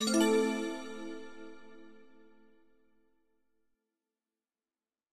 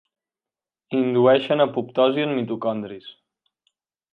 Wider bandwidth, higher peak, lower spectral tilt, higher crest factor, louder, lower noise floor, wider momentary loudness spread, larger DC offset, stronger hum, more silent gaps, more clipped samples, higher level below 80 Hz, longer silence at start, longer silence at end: first, 15.5 kHz vs 4.8 kHz; second, -16 dBFS vs -4 dBFS; second, -3.5 dB/octave vs -8.5 dB/octave; about the same, 20 dB vs 18 dB; second, -32 LUFS vs -21 LUFS; about the same, under -90 dBFS vs under -90 dBFS; first, 25 LU vs 13 LU; neither; neither; neither; neither; about the same, -76 dBFS vs -74 dBFS; second, 0 s vs 0.9 s; first, 3.2 s vs 1 s